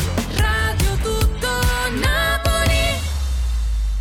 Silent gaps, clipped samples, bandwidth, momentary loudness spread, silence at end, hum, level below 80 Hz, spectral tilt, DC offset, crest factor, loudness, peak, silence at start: none; under 0.1%; 17.5 kHz; 5 LU; 0 s; none; -22 dBFS; -4 dB/octave; under 0.1%; 10 dB; -20 LUFS; -8 dBFS; 0 s